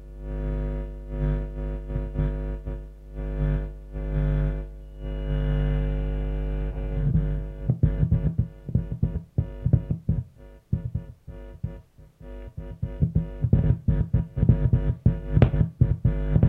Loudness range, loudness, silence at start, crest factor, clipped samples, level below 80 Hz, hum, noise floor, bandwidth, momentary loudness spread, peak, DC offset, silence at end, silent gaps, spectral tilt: 8 LU; -27 LUFS; 0 s; 22 dB; under 0.1%; -30 dBFS; none; -47 dBFS; 3.7 kHz; 15 LU; -4 dBFS; under 0.1%; 0 s; none; -11 dB/octave